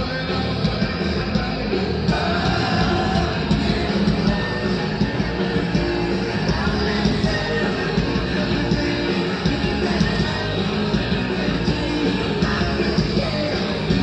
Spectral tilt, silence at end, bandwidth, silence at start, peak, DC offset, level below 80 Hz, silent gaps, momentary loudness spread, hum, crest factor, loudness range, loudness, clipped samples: -6.5 dB/octave; 0 s; 9 kHz; 0 s; -6 dBFS; under 0.1%; -32 dBFS; none; 3 LU; none; 14 dB; 1 LU; -21 LUFS; under 0.1%